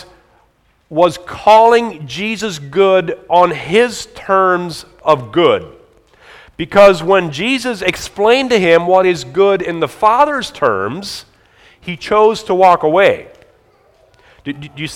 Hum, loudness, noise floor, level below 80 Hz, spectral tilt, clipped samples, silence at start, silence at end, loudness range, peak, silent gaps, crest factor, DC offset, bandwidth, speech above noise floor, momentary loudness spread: none; -13 LUFS; -55 dBFS; -48 dBFS; -4.5 dB/octave; 0.3%; 0.9 s; 0 s; 3 LU; 0 dBFS; none; 14 dB; under 0.1%; 16 kHz; 43 dB; 16 LU